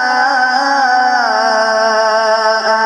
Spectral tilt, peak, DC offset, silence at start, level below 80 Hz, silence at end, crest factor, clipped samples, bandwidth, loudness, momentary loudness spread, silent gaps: -1 dB/octave; 0 dBFS; under 0.1%; 0 s; -62 dBFS; 0 s; 12 dB; under 0.1%; 11.5 kHz; -12 LUFS; 1 LU; none